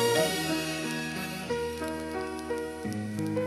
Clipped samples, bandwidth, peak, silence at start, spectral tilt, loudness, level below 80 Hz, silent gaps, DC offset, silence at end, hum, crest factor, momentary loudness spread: under 0.1%; 16 kHz; -12 dBFS; 0 s; -4 dB/octave; -32 LUFS; -58 dBFS; none; under 0.1%; 0 s; none; 20 dB; 8 LU